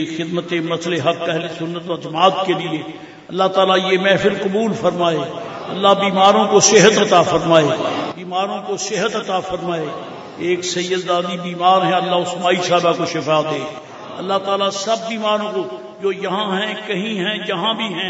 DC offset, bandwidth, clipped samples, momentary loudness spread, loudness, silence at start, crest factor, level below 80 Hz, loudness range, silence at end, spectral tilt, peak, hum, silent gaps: under 0.1%; 8 kHz; under 0.1%; 13 LU; -17 LUFS; 0 s; 18 dB; -58 dBFS; 7 LU; 0 s; -3.5 dB/octave; 0 dBFS; none; none